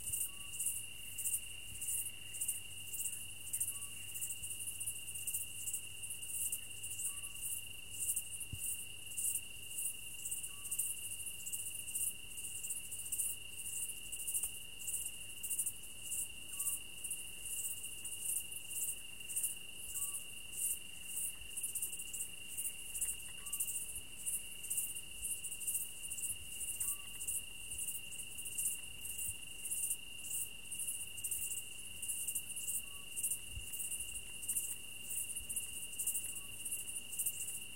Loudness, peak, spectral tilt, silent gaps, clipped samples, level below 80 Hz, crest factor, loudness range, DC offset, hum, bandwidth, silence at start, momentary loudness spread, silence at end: -40 LUFS; -22 dBFS; 0.5 dB/octave; none; under 0.1%; -64 dBFS; 22 dB; 1 LU; 0.3%; none; 17 kHz; 0 s; 6 LU; 0 s